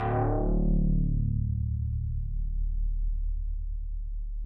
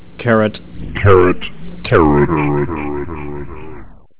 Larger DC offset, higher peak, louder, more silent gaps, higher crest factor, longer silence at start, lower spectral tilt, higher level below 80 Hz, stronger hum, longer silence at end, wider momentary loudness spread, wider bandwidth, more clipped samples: second, under 0.1% vs 3%; second, -16 dBFS vs 0 dBFS; second, -31 LUFS vs -14 LUFS; neither; about the same, 10 dB vs 14 dB; about the same, 0 s vs 0 s; about the same, -12.5 dB/octave vs -11.5 dB/octave; about the same, -30 dBFS vs -30 dBFS; neither; about the same, 0 s vs 0 s; second, 11 LU vs 19 LU; second, 2.8 kHz vs 4 kHz; neither